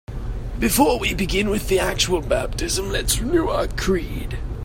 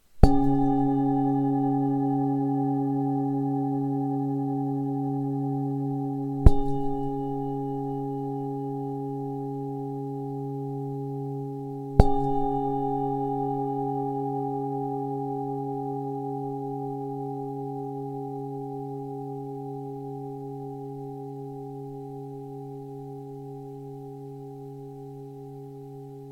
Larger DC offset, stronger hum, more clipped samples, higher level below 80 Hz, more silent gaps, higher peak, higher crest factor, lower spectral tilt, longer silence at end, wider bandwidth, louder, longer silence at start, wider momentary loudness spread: neither; neither; neither; first, -28 dBFS vs -36 dBFS; neither; about the same, -2 dBFS vs 0 dBFS; second, 18 dB vs 28 dB; second, -4 dB/octave vs -10 dB/octave; about the same, 0 s vs 0 s; first, 16.5 kHz vs 9.4 kHz; first, -21 LUFS vs -29 LUFS; about the same, 0.1 s vs 0.15 s; second, 12 LU vs 16 LU